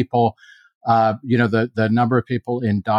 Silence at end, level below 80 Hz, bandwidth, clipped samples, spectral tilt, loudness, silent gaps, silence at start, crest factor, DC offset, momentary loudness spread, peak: 0 s; -58 dBFS; 6.8 kHz; under 0.1%; -9 dB/octave; -19 LUFS; 0.75-0.81 s; 0 s; 16 dB; under 0.1%; 5 LU; -4 dBFS